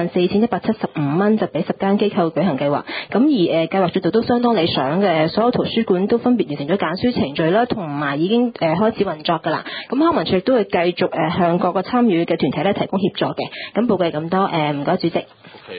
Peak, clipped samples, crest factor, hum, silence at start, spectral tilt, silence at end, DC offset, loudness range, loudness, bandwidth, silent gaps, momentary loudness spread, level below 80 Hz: -2 dBFS; under 0.1%; 16 dB; none; 0 s; -11.5 dB/octave; 0 s; under 0.1%; 2 LU; -18 LUFS; 5 kHz; none; 5 LU; -52 dBFS